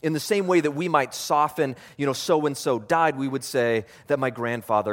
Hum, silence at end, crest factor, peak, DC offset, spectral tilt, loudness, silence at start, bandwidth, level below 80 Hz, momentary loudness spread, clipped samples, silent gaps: none; 0 s; 20 dB; -4 dBFS; under 0.1%; -5 dB/octave; -24 LUFS; 0.05 s; 17 kHz; -68 dBFS; 7 LU; under 0.1%; none